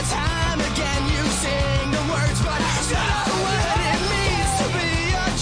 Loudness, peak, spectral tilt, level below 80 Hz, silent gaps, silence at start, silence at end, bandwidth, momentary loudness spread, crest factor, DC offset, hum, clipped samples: -21 LUFS; -10 dBFS; -4 dB/octave; -28 dBFS; none; 0 s; 0 s; 10.5 kHz; 2 LU; 12 dB; under 0.1%; none; under 0.1%